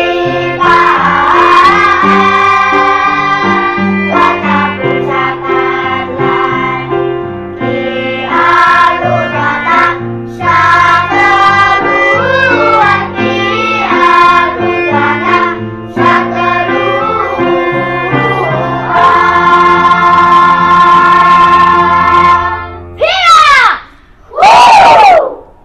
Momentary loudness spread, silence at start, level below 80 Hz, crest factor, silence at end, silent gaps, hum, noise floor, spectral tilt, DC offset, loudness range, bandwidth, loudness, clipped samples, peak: 9 LU; 0 s; -36 dBFS; 8 dB; 0.2 s; none; none; -36 dBFS; -5 dB/octave; 0.5%; 5 LU; 12 kHz; -7 LUFS; 2%; 0 dBFS